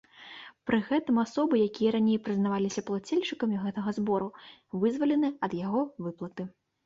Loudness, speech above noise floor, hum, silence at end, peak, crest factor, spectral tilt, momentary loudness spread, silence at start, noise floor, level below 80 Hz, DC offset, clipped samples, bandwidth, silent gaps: -29 LUFS; 20 dB; none; 0.35 s; -14 dBFS; 14 dB; -6.5 dB/octave; 13 LU; 0.2 s; -49 dBFS; -68 dBFS; under 0.1%; under 0.1%; 7.8 kHz; none